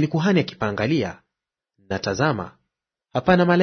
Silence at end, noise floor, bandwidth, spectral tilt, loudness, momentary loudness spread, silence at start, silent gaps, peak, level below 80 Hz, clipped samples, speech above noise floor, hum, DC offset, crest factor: 0 s; -85 dBFS; 6.6 kHz; -6.5 dB/octave; -22 LUFS; 12 LU; 0 s; none; -2 dBFS; -52 dBFS; under 0.1%; 65 dB; none; under 0.1%; 20 dB